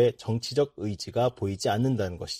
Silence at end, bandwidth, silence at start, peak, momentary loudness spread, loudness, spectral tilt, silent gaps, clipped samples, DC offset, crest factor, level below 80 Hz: 0 s; 15.5 kHz; 0 s; -12 dBFS; 5 LU; -28 LUFS; -6 dB/octave; none; under 0.1%; under 0.1%; 16 dB; -56 dBFS